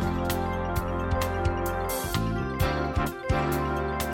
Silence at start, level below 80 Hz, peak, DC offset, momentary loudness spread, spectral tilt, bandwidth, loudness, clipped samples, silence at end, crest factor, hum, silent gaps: 0 s; -36 dBFS; -12 dBFS; under 0.1%; 3 LU; -5.5 dB/octave; 17 kHz; -28 LUFS; under 0.1%; 0 s; 14 dB; none; none